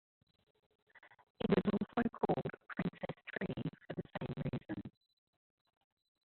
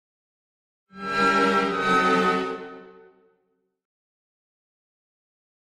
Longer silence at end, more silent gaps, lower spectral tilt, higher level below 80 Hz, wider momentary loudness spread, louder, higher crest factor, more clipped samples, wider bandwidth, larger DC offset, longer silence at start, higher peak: second, 1.35 s vs 2.85 s; first, 1.30-1.35 s vs none; first, -6.5 dB/octave vs -5 dB/octave; about the same, -64 dBFS vs -62 dBFS; second, 13 LU vs 17 LU; second, -40 LUFS vs -22 LUFS; about the same, 22 dB vs 18 dB; neither; second, 4.4 kHz vs 13.5 kHz; neither; about the same, 0.95 s vs 0.95 s; second, -20 dBFS vs -8 dBFS